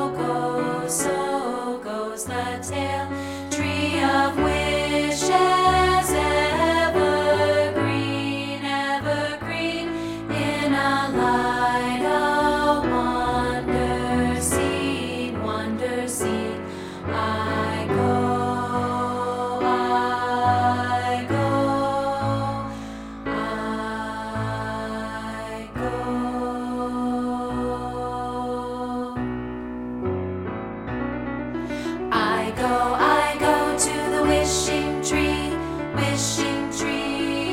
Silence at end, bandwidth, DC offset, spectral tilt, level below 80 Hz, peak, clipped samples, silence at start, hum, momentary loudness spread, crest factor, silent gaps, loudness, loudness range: 0 s; 16.5 kHz; under 0.1%; -4.5 dB/octave; -42 dBFS; -6 dBFS; under 0.1%; 0 s; none; 9 LU; 18 dB; none; -23 LUFS; 8 LU